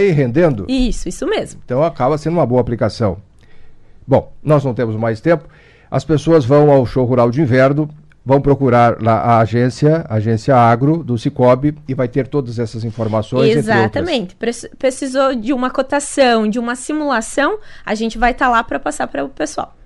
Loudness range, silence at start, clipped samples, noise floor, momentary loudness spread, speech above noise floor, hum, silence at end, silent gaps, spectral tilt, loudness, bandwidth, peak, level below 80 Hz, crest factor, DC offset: 5 LU; 0 s; under 0.1%; -36 dBFS; 10 LU; 22 dB; none; 0.2 s; none; -6.5 dB/octave; -15 LUFS; 12 kHz; -2 dBFS; -36 dBFS; 12 dB; under 0.1%